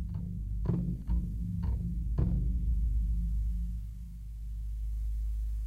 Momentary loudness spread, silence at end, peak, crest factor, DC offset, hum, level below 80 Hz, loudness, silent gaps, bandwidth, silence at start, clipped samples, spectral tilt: 10 LU; 0 s; -18 dBFS; 14 dB; under 0.1%; none; -34 dBFS; -35 LUFS; none; 1.8 kHz; 0 s; under 0.1%; -10 dB/octave